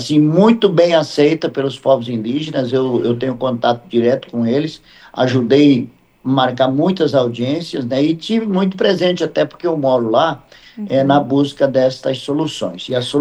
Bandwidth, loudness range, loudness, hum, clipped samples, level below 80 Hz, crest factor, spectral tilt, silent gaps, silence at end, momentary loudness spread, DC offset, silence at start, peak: 10 kHz; 2 LU; -16 LUFS; none; under 0.1%; -56 dBFS; 16 dB; -6.5 dB/octave; none; 0 s; 9 LU; under 0.1%; 0 s; 0 dBFS